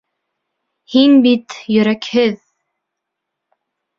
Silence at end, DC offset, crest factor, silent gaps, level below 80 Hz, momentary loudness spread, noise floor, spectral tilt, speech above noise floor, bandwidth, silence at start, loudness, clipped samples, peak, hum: 1.65 s; under 0.1%; 16 dB; none; -62 dBFS; 9 LU; -78 dBFS; -6 dB/octave; 66 dB; 7.2 kHz; 0.9 s; -14 LUFS; under 0.1%; -2 dBFS; none